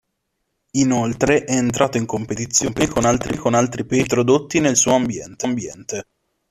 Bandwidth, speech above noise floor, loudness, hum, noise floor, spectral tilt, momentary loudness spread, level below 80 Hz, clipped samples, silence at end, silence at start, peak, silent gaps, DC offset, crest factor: 14 kHz; 55 dB; -19 LUFS; none; -74 dBFS; -4.5 dB/octave; 9 LU; -46 dBFS; under 0.1%; 0.5 s; 0.75 s; -2 dBFS; none; under 0.1%; 18 dB